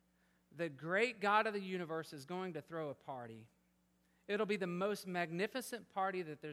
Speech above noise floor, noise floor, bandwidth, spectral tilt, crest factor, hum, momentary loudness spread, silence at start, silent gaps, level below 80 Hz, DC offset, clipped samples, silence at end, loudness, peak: 36 dB; -76 dBFS; 16 kHz; -5 dB/octave; 22 dB; none; 12 LU; 0.55 s; none; -86 dBFS; under 0.1%; under 0.1%; 0 s; -40 LUFS; -18 dBFS